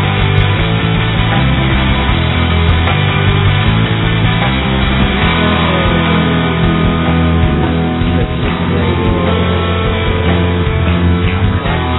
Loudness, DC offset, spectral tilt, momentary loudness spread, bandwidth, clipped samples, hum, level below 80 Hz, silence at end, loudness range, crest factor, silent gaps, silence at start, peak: -12 LUFS; 0.2%; -10 dB/octave; 3 LU; 4.1 kHz; under 0.1%; none; -20 dBFS; 0 s; 1 LU; 12 dB; none; 0 s; 0 dBFS